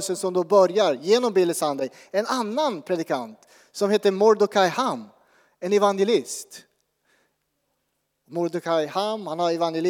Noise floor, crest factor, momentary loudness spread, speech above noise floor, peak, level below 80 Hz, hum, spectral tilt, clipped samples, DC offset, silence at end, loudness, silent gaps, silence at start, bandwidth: -75 dBFS; 18 dB; 13 LU; 53 dB; -6 dBFS; -86 dBFS; none; -4.5 dB/octave; under 0.1%; under 0.1%; 0 s; -23 LUFS; none; 0 s; 17 kHz